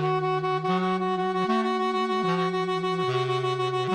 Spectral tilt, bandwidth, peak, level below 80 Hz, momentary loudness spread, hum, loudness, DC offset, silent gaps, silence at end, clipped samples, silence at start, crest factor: -6.5 dB/octave; 9.8 kHz; -12 dBFS; -68 dBFS; 2 LU; none; -26 LUFS; under 0.1%; none; 0 s; under 0.1%; 0 s; 12 dB